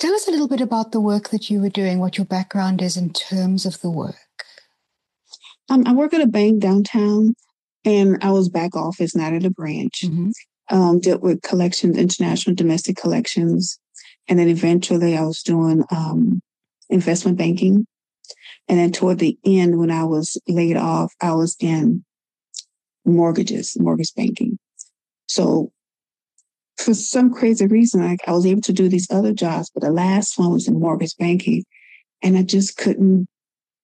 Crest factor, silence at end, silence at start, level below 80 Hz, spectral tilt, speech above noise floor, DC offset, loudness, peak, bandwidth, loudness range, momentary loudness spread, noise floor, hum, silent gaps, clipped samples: 14 dB; 0.6 s; 0 s; -72 dBFS; -6 dB/octave; over 73 dB; under 0.1%; -18 LUFS; -6 dBFS; 11.5 kHz; 4 LU; 9 LU; under -90 dBFS; none; 7.59-7.68 s, 7.74-7.80 s; under 0.1%